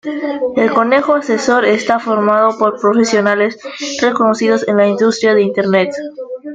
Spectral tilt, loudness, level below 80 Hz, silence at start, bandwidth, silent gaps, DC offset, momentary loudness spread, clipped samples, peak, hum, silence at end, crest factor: -4.5 dB/octave; -13 LUFS; -58 dBFS; 0.05 s; 9.2 kHz; none; under 0.1%; 8 LU; under 0.1%; 0 dBFS; none; 0 s; 12 dB